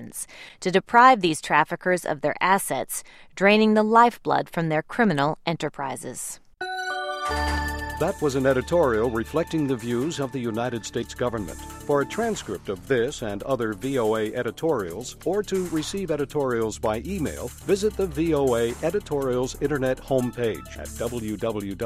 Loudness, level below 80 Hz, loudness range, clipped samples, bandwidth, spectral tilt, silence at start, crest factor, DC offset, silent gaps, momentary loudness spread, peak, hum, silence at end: -24 LUFS; -44 dBFS; 6 LU; under 0.1%; 16 kHz; -5 dB/octave; 0 s; 22 dB; under 0.1%; none; 12 LU; -2 dBFS; none; 0 s